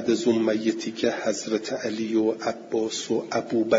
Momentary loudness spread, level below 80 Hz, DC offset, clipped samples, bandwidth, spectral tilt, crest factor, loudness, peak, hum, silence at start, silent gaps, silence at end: 5 LU; -68 dBFS; under 0.1%; under 0.1%; 7.8 kHz; -4.5 dB/octave; 16 dB; -26 LUFS; -8 dBFS; none; 0 s; none; 0 s